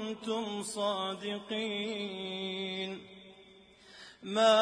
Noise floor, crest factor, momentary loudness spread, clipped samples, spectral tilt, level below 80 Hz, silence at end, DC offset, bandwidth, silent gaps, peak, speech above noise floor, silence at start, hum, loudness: -58 dBFS; 22 dB; 19 LU; under 0.1%; -3.5 dB/octave; -76 dBFS; 0 s; under 0.1%; 10.5 kHz; none; -12 dBFS; 25 dB; 0 s; none; -34 LUFS